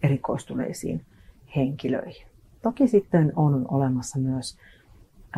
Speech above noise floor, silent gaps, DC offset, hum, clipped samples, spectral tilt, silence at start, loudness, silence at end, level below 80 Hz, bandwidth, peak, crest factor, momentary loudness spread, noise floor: 27 dB; none; under 0.1%; none; under 0.1%; -7.5 dB/octave; 0 s; -25 LUFS; 0 s; -54 dBFS; 12.5 kHz; -8 dBFS; 18 dB; 11 LU; -52 dBFS